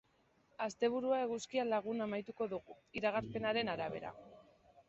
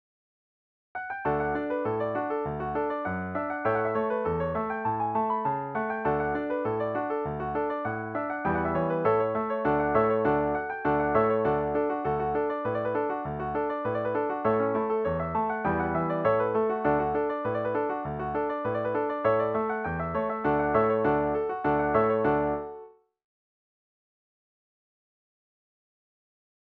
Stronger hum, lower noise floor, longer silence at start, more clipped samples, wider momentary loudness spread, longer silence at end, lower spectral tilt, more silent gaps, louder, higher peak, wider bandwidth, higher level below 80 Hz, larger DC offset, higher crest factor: neither; first, -73 dBFS vs -49 dBFS; second, 0.6 s vs 0.95 s; neither; first, 11 LU vs 7 LU; second, 0.45 s vs 3.85 s; second, -3.5 dB/octave vs -10 dB/octave; neither; second, -38 LUFS vs -28 LUFS; second, -20 dBFS vs -10 dBFS; first, 7.6 kHz vs 4.6 kHz; second, -72 dBFS vs -52 dBFS; neither; about the same, 18 dB vs 18 dB